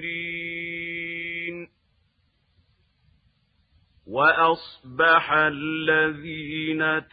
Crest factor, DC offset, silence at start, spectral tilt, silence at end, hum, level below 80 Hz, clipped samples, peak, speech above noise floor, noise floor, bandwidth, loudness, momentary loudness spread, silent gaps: 20 dB; under 0.1%; 0 s; -8 dB/octave; 0.1 s; none; -62 dBFS; under 0.1%; -6 dBFS; 46 dB; -68 dBFS; 5 kHz; -23 LUFS; 14 LU; none